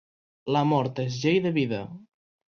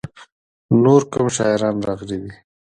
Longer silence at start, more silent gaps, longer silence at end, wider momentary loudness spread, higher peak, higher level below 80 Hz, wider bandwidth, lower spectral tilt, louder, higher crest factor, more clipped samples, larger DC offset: first, 0.45 s vs 0.05 s; second, none vs 0.32-0.69 s; about the same, 0.55 s vs 0.45 s; second, 12 LU vs 17 LU; second, -10 dBFS vs 0 dBFS; second, -64 dBFS vs -52 dBFS; second, 7 kHz vs 10 kHz; about the same, -6.5 dB/octave vs -6 dB/octave; second, -26 LUFS vs -18 LUFS; about the same, 16 dB vs 18 dB; neither; neither